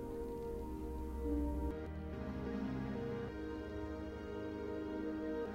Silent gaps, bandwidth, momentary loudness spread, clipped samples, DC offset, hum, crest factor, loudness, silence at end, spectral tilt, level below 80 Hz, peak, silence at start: none; 16 kHz; 5 LU; under 0.1%; under 0.1%; none; 14 dB; -43 LUFS; 0 s; -8 dB/octave; -48 dBFS; -28 dBFS; 0 s